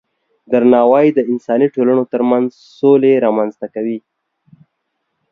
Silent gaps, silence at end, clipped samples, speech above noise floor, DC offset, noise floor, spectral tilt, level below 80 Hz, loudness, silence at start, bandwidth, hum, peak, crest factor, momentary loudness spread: none; 1.35 s; under 0.1%; 58 dB; under 0.1%; -71 dBFS; -9 dB/octave; -62 dBFS; -14 LUFS; 0.5 s; 6.2 kHz; none; 0 dBFS; 14 dB; 12 LU